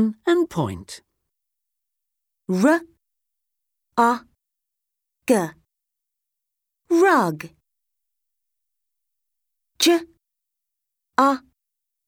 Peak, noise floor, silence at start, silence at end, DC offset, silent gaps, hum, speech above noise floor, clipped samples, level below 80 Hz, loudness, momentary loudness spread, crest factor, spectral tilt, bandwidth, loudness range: -4 dBFS; -84 dBFS; 0 s; 0.7 s; under 0.1%; none; none; 64 dB; under 0.1%; -64 dBFS; -21 LUFS; 18 LU; 22 dB; -4.5 dB/octave; 19.5 kHz; 4 LU